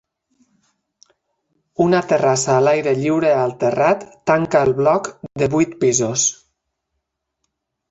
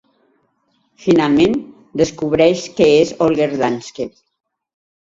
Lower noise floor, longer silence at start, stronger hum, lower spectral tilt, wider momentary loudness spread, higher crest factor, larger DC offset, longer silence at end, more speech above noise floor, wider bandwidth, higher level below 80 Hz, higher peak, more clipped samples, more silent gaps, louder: first, -76 dBFS vs -63 dBFS; first, 1.8 s vs 1.05 s; neither; about the same, -4.5 dB/octave vs -5.5 dB/octave; second, 5 LU vs 14 LU; about the same, 16 dB vs 16 dB; neither; first, 1.55 s vs 0.95 s; first, 60 dB vs 49 dB; about the same, 8.2 kHz vs 7.8 kHz; second, -56 dBFS vs -50 dBFS; about the same, -2 dBFS vs 0 dBFS; neither; neither; about the same, -17 LUFS vs -15 LUFS